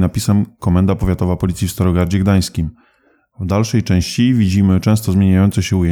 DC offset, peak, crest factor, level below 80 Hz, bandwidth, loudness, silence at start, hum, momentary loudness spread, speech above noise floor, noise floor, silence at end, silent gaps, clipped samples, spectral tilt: under 0.1%; -4 dBFS; 10 dB; -34 dBFS; 18 kHz; -15 LUFS; 0 s; none; 6 LU; 42 dB; -57 dBFS; 0 s; none; under 0.1%; -6.5 dB/octave